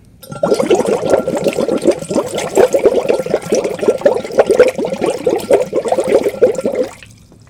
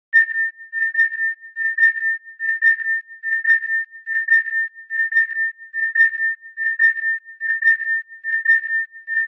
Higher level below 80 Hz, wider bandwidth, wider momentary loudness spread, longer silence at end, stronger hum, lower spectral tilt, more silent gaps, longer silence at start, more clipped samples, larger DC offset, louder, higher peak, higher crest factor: first, -48 dBFS vs under -90 dBFS; first, 17 kHz vs 5.8 kHz; about the same, 6 LU vs 8 LU; first, 0.35 s vs 0 s; neither; first, -5 dB/octave vs 7.5 dB/octave; neither; about the same, 0.25 s vs 0.15 s; first, 0.3% vs under 0.1%; neither; first, -14 LUFS vs -18 LUFS; first, 0 dBFS vs -4 dBFS; about the same, 14 dB vs 16 dB